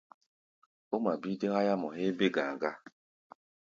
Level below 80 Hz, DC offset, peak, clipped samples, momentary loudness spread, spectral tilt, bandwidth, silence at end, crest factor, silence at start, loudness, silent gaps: -78 dBFS; under 0.1%; -14 dBFS; under 0.1%; 8 LU; -6.5 dB/octave; 7.4 kHz; 0.9 s; 20 dB; 0.9 s; -32 LUFS; none